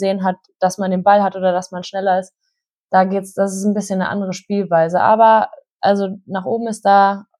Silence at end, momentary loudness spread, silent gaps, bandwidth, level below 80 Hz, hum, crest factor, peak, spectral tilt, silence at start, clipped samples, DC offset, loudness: 0.15 s; 10 LU; 2.70-2.84 s, 5.71-5.80 s; 13 kHz; -70 dBFS; none; 16 dB; -2 dBFS; -5.5 dB/octave; 0 s; under 0.1%; under 0.1%; -17 LUFS